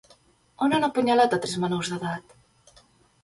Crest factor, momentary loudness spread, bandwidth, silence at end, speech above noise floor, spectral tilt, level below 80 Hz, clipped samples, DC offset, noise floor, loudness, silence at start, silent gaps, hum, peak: 18 dB; 11 LU; 11.5 kHz; 1.05 s; 35 dB; -5 dB/octave; -64 dBFS; under 0.1%; under 0.1%; -59 dBFS; -24 LUFS; 0.6 s; none; none; -8 dBFS